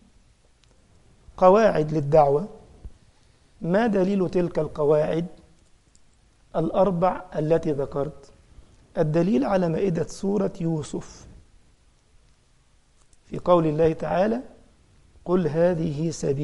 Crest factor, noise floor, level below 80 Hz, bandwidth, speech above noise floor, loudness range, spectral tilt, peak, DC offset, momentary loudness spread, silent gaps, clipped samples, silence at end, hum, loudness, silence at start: 22 dB; -59 dBFS; -48 dBFS; 11.5 kHz; 37 dB; 5 LU; -7.5 dB/octave; -4 dBFS; under 0.1%; 13 LU; none; under 0.1%; 0 s; none; -23 LUFS; 1.35 s